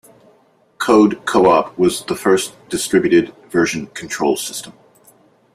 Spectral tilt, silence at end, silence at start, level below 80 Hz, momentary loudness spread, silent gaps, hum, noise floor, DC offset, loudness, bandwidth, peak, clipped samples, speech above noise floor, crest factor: -4.5 dB/octave; 0.85 s; 0.8 s; -54 dBFS; 11 LU; none; none; -55 dBFS; under 0.1%; -16 LUFS; 15 kHz; -2 dBFS; under 0.1%; 39 dB; 16 dB